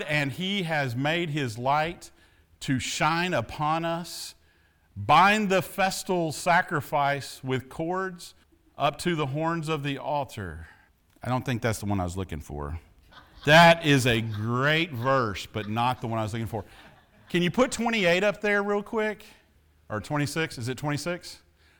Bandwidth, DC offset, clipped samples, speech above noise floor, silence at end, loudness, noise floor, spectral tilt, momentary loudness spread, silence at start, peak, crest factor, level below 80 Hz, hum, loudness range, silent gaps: over 20 kHz; under 0.1%; under 0.1%; 37 dB; 0.45 s; -26 LUFS; -63 dBFS; -5 dB/octave; 15 LU; 0 s; -6 dBFS; 20 dB; -54 dBFS; none; 8 LU; none